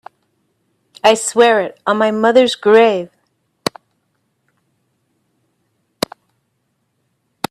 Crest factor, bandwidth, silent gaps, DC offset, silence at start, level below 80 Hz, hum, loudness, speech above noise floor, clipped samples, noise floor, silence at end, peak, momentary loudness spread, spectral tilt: 18 dB; 15 kHz; none; under 0.1%; 1.05 s; -64 dBFS; none; -14 LUFS; 55 dB; under 0.1%; -67 dBFS; 4.45 s; 0 dBFS; 14 LU; -3 dB/octave